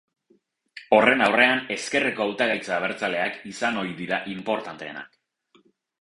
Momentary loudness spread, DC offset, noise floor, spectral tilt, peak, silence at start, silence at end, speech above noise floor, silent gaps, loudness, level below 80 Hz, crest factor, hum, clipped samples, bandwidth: 12 LU; under 0.1%; -65 dBFS; -4 dB/octave; -4 dBFS; 0.75 s; 0.95 s; 41 dB; none; -23 LUFS; -66 dBFS; 22 dB; none; under 0.1%; 11.5 kHz